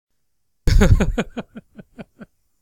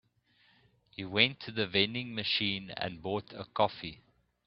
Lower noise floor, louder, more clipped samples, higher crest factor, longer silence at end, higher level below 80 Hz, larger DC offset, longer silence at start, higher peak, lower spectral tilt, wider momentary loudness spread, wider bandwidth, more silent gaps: first, -76 dBFS vs -69 dBFS; first, -19 LUFS vs -31 LUFS; neither; second, 18 dB vs 30 dB; about the same, 0.4 s vs 0.5 s; first, -22 dBFS vs -68 dBFS; neither; second, 0.65 s vs 1 s; first, -2 dBFS vs -6 dBFS; first, -6.5 dB/octave vs -1.5 dB/octave; first, 26 LU vs 16 LU; first, 14 kHz vs 5.8 kHz; neither